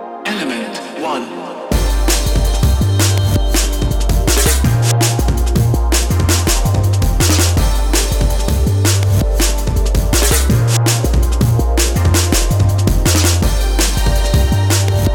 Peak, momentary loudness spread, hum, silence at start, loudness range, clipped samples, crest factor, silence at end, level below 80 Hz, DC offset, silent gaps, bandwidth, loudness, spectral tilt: 0 dBFS; 6 LU; none; 0 s; 2 LU; under 0.1%; 12 dB; 0 s; -16 dBFS; under 0.1%; none; 18 kHz; -14 LUFS; -4.5 dB/octave